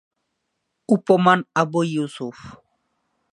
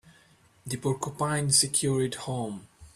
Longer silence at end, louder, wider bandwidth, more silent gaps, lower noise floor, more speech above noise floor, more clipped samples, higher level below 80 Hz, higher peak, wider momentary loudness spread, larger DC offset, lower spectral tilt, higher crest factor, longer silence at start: first, 0.8 s vs 0.05 s; first, -19 LUFS vs -27 LUFS; second, 11 kHz vs 14.5 kHz; neither; first, -76 dBFS vs -60 dBFS; first, 56 dB vs 33 dB; neither; about the same, -66 dBFS vs -62 dBFS; first, 0 dBFS vs -8 dBFS; about the same, 15 LU vs 16 LU; neither; first, -6.5 dB/octave vs -3.5 dB/octave; about the same, 22 dB vs 20 dB; first, 0.9 s vs 0.65 s